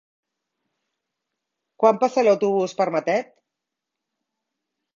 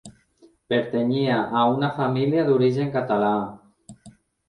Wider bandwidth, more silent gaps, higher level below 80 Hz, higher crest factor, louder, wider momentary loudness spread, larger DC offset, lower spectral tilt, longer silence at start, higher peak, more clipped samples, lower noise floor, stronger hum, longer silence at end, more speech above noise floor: second, 7.4 kHz vs 10.5 kHz; neither; second, -74 dBFS vs -62 dBFS; first, 22 dB vs 16 dB; about the same, -21 LUFS vs -22 LUFS; about the same, 5 LU vs 5 LU; neither; second, -5.5 dB/octave vs -7.5 dB/octave; first, 1.8 s vs 0.05 s; first, -2 dBFS vs -8 dBFS; neither; first, -84 dBFS vs -57 dBFS; neither; first, 1.7 s vs 0.4 s; first, 64 dB vs 36 dB